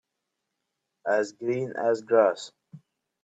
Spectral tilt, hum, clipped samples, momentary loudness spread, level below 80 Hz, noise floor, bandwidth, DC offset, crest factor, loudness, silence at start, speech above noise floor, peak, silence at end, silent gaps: -5.5 dB/octave; none; under 0.1%; 14 LU; -78 dBFS; -83 dBFS; 8.4 kHz; under 0.1%; 20 dB; -26 LUFS; 1.05 s; 57 dB; -8 dBFS; 0.45 s; none